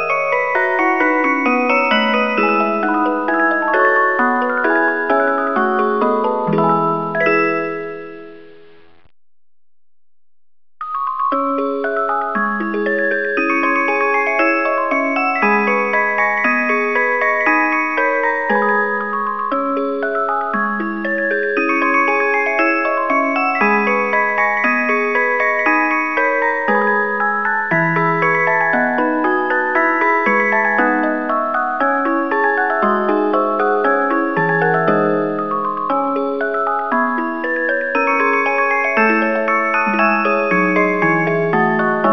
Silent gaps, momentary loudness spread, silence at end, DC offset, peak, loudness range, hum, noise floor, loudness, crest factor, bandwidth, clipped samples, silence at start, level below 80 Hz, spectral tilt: none; 5 LU; 0 s; 0.9%; 0 dBFS; 4 LU; none; -47 dBFS; -16 LUFS; 16 dB; 6.6 kHz; under 0.1%; 0 s; -62 dBFS; -6.5 dB/octave